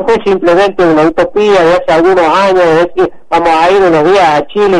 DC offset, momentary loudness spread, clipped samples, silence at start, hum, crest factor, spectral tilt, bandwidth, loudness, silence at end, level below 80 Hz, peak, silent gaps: under 0.1%; 3 LU; under 0.1%; 0 s; none; 8 dB; -5.5 dB/octave; 11 kHz; -8 LUFS; 0 s; -36 dBFS; 0 dBFS; none